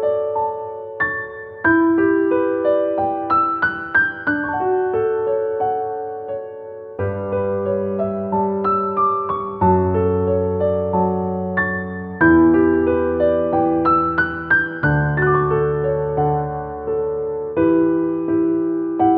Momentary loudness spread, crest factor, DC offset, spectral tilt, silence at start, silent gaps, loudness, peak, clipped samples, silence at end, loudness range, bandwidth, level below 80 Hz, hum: 9 LU; 16 dB; under 0.1%; -11.5 dB/octave; 0 s; none; -19 LUFS; -2 dBFS; under 0.1%; 0 s; 5 LU; 4.8 kHz; -44 dBFS; none